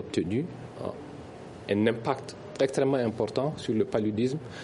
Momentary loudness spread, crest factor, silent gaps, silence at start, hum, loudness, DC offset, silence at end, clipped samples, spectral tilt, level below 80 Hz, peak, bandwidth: 16 LU; 18 dB; none; 0 s; none; -29 LUFS; under 0.1%; 0 s; under 0.1%; -6.5 dB/octave; -60 dBFS; -10 dBFS; 11.5 kHz